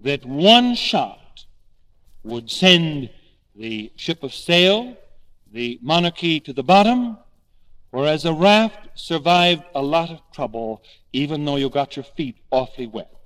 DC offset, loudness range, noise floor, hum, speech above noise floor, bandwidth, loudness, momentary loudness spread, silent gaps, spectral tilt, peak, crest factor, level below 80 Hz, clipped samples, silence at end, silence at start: under 0.1%; 4 LU; -52 dBFS; none; 33 dB; 14.5 kHz; -18 LUFS; 17 LU; none; -5 dB/octave; 0 dBFS; 20 dB; -50 dBFS; under 0.1%; 0.2 s; 0.05 s